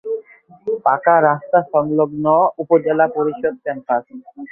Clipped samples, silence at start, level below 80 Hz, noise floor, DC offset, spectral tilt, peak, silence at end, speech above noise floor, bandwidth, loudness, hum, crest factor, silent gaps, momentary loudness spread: under 0.1%; 0.05 s; -62 dBFS; -41 dBFS; under 0.1%; -11 dB/octave; -2 dBFS; 0.05 s; 25 dB; 3.3 kHz; -17 LUFS; none; 16 dB; none; 13 LU